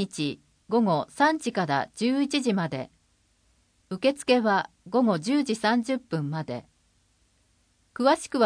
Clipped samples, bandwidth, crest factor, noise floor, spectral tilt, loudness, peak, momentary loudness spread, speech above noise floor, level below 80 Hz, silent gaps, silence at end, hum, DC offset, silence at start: under 0.1%; 10.5 kHz; 18 dB; -67 dBFS; -5 dB/octave; -26 LUFS; -8 dBFS; 12 LU; 42 dB; -68 dBFS; none; 0 s; none; under 0.1%; 0 s